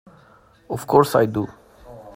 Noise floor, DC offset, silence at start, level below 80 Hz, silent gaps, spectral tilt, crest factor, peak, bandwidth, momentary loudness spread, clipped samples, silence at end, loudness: -53 dBFS; under 0.1%; 0.7 s; -54 dBFS; none; -6.5 dB/octave; 22 dB; 0 dBFS; 16 kHz; 16 LU; under 0.1%; 0.05 s; -19 LUFS